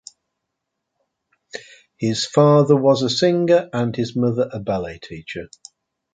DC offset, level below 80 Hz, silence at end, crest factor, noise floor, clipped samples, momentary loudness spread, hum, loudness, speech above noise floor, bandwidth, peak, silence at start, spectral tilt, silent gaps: under 0.1%; -56 dBFS; 0.7 s; 18 dB; -79 dBFS; under 0.1%; 22 LU; none; -18 LUFS; 61 dB; 9.4 kHz; -2 dBFS; 1.55 s; -6 dB/octave; none